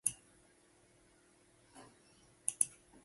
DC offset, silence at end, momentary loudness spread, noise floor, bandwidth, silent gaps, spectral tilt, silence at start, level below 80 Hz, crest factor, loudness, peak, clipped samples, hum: under 0.1%; 0.35 s; 26 LU; -68 dBFS; 12 kHz; none; 0 dB/octave; 0.05 s; -78 dBFS; 36 dB; -37 LUFS; -10 dBFS; under 0.1%; none